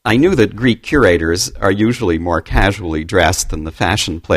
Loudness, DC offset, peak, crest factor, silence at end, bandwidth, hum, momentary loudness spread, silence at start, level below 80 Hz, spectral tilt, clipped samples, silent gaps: -15 LUFS; under 0.1%; 0 dBFS; 14 dB; 0 s; 15.5 kHz; none; 6 LU; 0.05 s; -26 dBFS; -4.5 dB/octave; under 0.1%; none